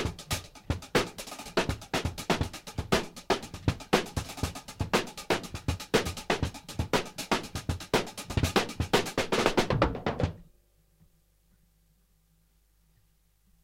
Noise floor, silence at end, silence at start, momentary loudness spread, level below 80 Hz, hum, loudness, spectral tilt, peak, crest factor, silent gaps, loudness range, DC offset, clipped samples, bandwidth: -67 dBFS; 3.2 s; 0 s; 9 LU; -44 dBFS; none; -31 LUFS; -4.5 dB/octave; -8 dBFS; 24 dB; none; 3 LU; under 0.1%; under 0.1%; 16.5 kHz